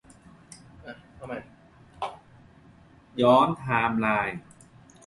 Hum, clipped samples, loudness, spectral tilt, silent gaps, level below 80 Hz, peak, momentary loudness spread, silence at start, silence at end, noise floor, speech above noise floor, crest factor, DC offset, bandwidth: none; under 0.1%; -24 LUFS; -6.5 dB/octave; none; -58 dBFS; -8 dBFS; 25 LU; 0.5 s; 0.65 s; -54 dBFS; 31 dB; 22 dB; under 0.1%; 11.5 kHz